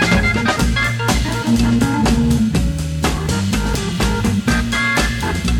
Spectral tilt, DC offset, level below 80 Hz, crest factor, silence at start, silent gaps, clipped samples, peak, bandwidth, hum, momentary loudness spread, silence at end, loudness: -5 dB/octave; under 0.1%; -24 dBFS; 14 dB; 0 s; none; under 0.1%; -2 dBFS; 17.5 kHz; none; 4 LU; 0 s; -17 LUFS